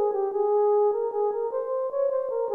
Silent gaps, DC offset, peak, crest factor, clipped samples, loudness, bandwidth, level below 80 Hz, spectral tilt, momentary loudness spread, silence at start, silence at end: none; under 0.1%; -14 dBFS; 10 dB; under 0.1%; -25 LUFS; 2.2 kHz; -74 dBFS; -8 dB/octave; 6 LU; 0 s; 0 s